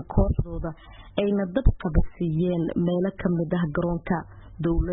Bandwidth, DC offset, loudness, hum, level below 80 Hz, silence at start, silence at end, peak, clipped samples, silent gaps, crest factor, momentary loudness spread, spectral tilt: 4 kHz; under 0.1%; -26 LUFS; none; -30 dBFS; 0 s; 0 s; -8 dBFS; under 0.1%; none; 16 dB; 9 LU; -12.5 dB/octave